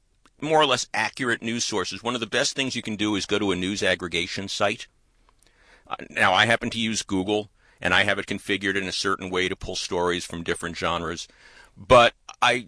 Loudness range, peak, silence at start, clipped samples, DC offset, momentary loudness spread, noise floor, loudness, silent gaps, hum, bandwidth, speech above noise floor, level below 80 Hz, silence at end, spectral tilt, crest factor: 3 LU; -4 dBFS; 0.4 s; under 0.1%; under 0.1%; 11 LU; -61 dBFS; -23 LUFS; none; none; 11 kHz; 37 dB; -52 dBFS; 0 s; -3 dB/octave; 20 dB